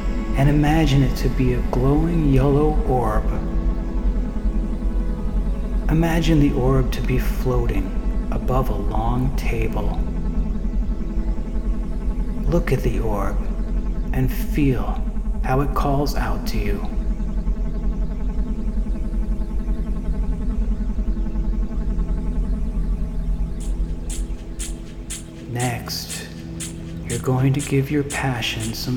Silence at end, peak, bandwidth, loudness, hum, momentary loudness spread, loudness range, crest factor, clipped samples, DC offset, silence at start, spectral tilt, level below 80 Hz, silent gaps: 0 s; -4 dBFS; 17 kHz; -23 LUFS; none; 9 LU; 7 LU; 16 dB; under 0.1%; under 0.1%; 0 s; -6.5 dB/octave; -24 dBFS; none